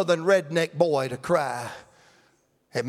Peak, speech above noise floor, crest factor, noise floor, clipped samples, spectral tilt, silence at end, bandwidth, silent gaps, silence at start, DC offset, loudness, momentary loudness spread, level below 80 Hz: -6 dBFS; 41 dB; 20 dB; -65 dBFS; under 0.1%; -5 dB/octave; 0 s; 15 kHz; none; 0 s; under 0.1%; -24 LUFS; 14 LU; -68 dBFS